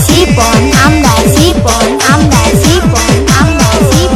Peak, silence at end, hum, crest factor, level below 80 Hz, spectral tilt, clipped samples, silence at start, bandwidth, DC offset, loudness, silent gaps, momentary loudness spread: 0 dBFS; 0 s; none; 6 dB; -18 dBFS; -4.5 dB/octave; 3%; 0 s; over 20 kHz; under 0.1%; -7 LUFS; none; 2 LU